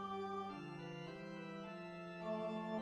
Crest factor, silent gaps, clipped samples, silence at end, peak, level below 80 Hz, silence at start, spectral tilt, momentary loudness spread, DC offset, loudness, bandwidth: 14 dB; none; under 0.1%; 0 s; -32 dBFS; -78 dBFS; 0 s; -7 dB/octave; 7 LU; under 0.1%; -47 LUFS; 11 kHz